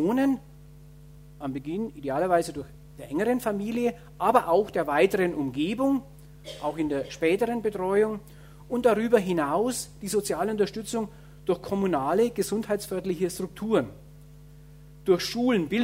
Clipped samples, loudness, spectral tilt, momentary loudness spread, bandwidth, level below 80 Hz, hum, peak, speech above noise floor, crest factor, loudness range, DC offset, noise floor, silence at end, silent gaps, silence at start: under 0.1%; -27 LUFS; -5.5 dB/octave; 11 LU; 16 kHz; -54 dBFS; none; -4 dBFS; 23 dB; 22 dB; 4 LU; under 0.1%; -49 dBFS; 0 s; none; 0 s